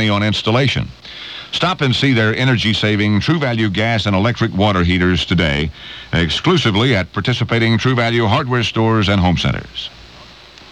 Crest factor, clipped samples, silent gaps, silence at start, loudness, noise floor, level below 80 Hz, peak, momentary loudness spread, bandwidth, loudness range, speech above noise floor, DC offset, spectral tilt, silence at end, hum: 14 dB; under 0.1%; none; 0 s; -15 LUFS; -40 dBFS; -36 dBFS; -2 dBFS; 9 LU; 10 kHz; 1 LU; 24 dB; 0.1%; -6 dB/octave; 0.05 s; none